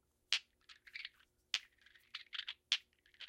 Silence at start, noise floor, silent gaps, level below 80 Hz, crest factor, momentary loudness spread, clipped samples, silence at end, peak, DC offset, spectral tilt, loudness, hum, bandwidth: 0.3 s; -68 dBFS; none; -86 dBFS; 34 dB; 14 LU; under 0.1%; 0 s; -14 dBFS; under 0.1%; 3.5 dB/octave; -42 LUFS; none; 16 kHz